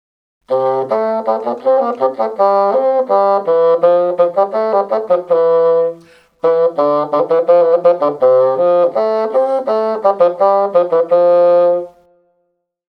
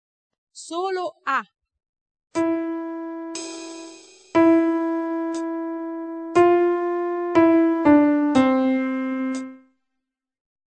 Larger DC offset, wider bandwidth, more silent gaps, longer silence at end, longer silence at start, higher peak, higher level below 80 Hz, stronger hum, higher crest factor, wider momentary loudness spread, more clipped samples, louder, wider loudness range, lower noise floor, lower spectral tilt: neither; second, 5.2 kHz vs 9 kHz; second, none vs 1.89-1.93 s, 2.01-2.15 s; about the same, 1.1 s vs 1.1 s; about the same, 0.5 s vs 0.55 s; first, 0 dBFS vs -4 dBFS; second, -70 dBFS vs -62 dBFS; neither; second, 12 dB vs 18 dB; second, 6 LU vs 15 LU; neither; first, -13 LUFS vs -21 LUFS; second, 2 LU vs 9 LU; second, -66 dBFS vs -81 dBFS; first, -7.5 dB/octave vs -5 dB/octave